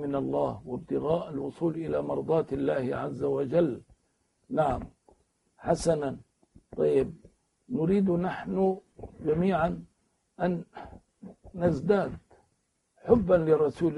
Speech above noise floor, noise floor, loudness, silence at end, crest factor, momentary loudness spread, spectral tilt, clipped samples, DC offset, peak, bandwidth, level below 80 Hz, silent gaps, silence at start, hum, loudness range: 47 dB; -75 dBFS; -28 LUFS; 0 s; 22 dB; 16 LU; -8 dB/octave; under 0.1%; under 0.1%; -8 dBFS; 11.5 kHz; -52 dBFS; none; 0 s; none; 3 LU